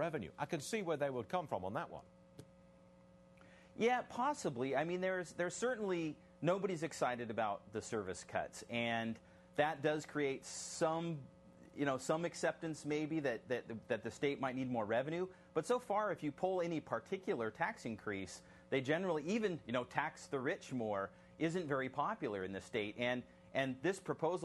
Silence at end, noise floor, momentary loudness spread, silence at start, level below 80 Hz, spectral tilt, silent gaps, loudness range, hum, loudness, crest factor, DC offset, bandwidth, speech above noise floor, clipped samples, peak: 0 s; -64 dBFS; 7 LU; 0 s; -74 dBFS; -5 dB/octave; none; 2 LU; none; -40 LUFS; 22 dB; under 0.1%; 12 kHz; 24 dB; under 0.1%; -18 dBFS